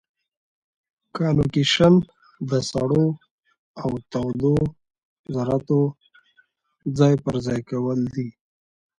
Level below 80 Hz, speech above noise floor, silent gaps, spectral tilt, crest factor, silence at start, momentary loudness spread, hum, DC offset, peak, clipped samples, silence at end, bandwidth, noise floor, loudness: -48 dBFS; 42 dB; 3.31-3.38 s, 3.58-3.74 s, 5.05-5.24 s; -6.5 dB/octave; 20 dB; 1.15 s; 14 LU; none; under 0.1%; -4 dBFS; under 0.1%; 0.7 s; 10.5 kHz; -63 dBFS; -22 LUFS